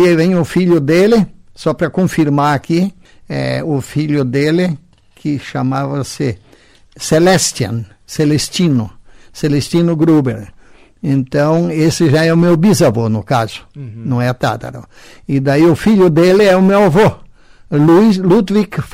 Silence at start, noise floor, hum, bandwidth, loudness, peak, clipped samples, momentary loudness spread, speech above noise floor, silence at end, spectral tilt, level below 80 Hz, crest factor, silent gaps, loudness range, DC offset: 0 s; -45 dBFS; none; 16 kHz; -13 LUFS; -2 dBFS; under 0.1%; 13 LU; 33 dB; 0.05 s; -6 dB/octave; -42 dBFS; 10 dB; none; 6 LU; under 0.1%